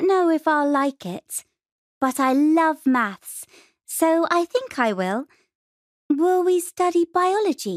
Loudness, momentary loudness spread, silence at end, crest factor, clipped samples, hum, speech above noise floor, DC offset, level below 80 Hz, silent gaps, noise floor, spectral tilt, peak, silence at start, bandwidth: -21 LUFS; 13 LU; 0 s; 16 dB; under 0.1%; none; over 69 dB; under 0.1%; -74 dBFS; 1.72-2.01 s, 5.55-6.09 s; under -90 dBFS; -4.5 dB/octave; -6 dBFS; 0 s; 15.5 kHz